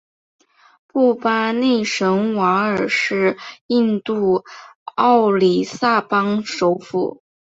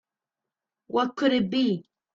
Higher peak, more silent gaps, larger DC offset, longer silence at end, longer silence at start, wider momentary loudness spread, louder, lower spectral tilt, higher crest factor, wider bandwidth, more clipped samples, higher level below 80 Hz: first, -2 dBFS vs -10 dBFS; first, 3.61-3.69 s, 4.75-4.86 s vs none; neither; about the same, 0.35 s vs 0.35 s; about the same, 0.95 s vs 0.9 s; about the same, 8 LU vs 6 LU; first, -18 LUFS vs -26 LUFS; about the same, -5.5 dB/octave vs -6.5 dB/octave; about the same, 16 dB vs 18 dB; about the same, 8 kHz vs 7.4 kHz; neither; first, -62 dBFS vs -68 dBFS